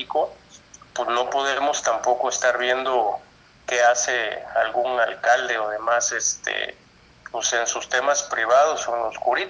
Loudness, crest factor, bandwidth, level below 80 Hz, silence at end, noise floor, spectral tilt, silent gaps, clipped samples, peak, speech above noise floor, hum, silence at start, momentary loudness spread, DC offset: -22 LUFS; 16 dB; 10.5 kHz; -62 dBFS; 0 s; -46 dBFS; 0 dB/octave; none; under 0.1%; -6 dBFS; 24 dB; none; 0 s; 8 LU; under 0.1%